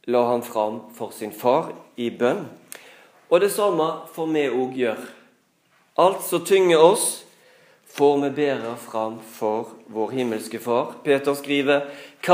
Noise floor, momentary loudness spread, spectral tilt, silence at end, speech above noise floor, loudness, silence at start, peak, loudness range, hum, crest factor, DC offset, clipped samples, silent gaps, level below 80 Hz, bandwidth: -62 dBFS; 15 LU; -4 dB/octave; 0 s; 41 dB; -22 LUFS; 0.05 s; 0 dBFS; 5 LU; none; 22 dB; under 0.1%; under 0.1%; none; -82 dBFS; 15.5 kHz